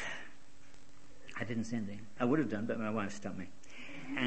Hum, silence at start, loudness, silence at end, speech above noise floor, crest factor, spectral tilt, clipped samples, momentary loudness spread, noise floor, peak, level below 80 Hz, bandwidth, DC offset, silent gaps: none; 0 s; -38 LUFS; 0 s; 25 dB; 22 dB; -6 dB/octave; under 0.1%; 17 LU; -61 dBFS; -16 dBFS; -68 dBFS; 8.4 kHz; 0.8%; none